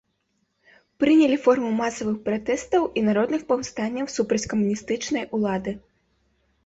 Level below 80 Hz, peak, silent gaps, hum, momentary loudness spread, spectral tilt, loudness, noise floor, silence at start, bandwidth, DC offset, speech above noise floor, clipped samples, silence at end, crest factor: -58 dBFS; -6 dBFS; none; none; 9 LU; -5 dB/octave; -23 LUFS; -72 dBFS; 1 s; 8 kHz; under 0.1%; 50 dB; under 0.1%; 0.85 s; 18 dB